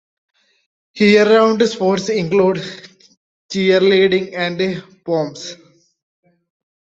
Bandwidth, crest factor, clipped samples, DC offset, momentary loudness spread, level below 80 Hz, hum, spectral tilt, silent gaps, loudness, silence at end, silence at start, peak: 8 kHz; 16 dB; under 0.1%; under 0.1%; 16 LU; -60 dBFS; none; -5.5 dB/octave; 3.17-3.49 s; -15 LUFS; 1.3 s; 0.95 s; 0 dBFS